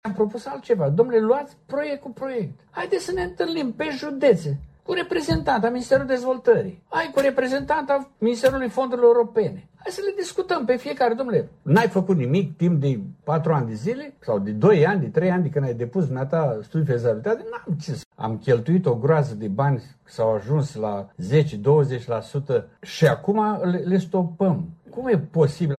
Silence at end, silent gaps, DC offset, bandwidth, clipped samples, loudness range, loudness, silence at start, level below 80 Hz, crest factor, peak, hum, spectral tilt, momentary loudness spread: 0.05 s; 18.05-18.11 s; under 0.1%; 13 kHz; under 0.1%; 3 LU; -23 LUFS; 0.05 s; -52 dBFS; 18 dB; -4 dBFS; none; -7.5 dB/octave; 10 LU